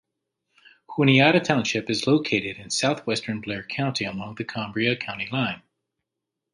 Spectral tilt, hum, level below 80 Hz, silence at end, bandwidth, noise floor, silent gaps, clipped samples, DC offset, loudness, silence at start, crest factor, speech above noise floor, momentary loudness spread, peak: -4.5 dB/octave; none; -62 dBFS; 0.95 s; 11.5 kHz; -84 dBFS; none; under 0.1%; under 0.1%; -24 LUFS; 0.9 s; 22 dB; 61 dB; 13 LU; -2 dBFS